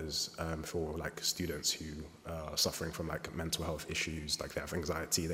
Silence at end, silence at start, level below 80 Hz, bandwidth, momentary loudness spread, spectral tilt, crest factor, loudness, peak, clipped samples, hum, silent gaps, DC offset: 0 s; 0 s; -52 dBFS; 16 kHz; 7 LU; -3 dB/octave; 20 dB; -37 LUFS; -18 dBFS; under 0.1%; none; none; under 0.1%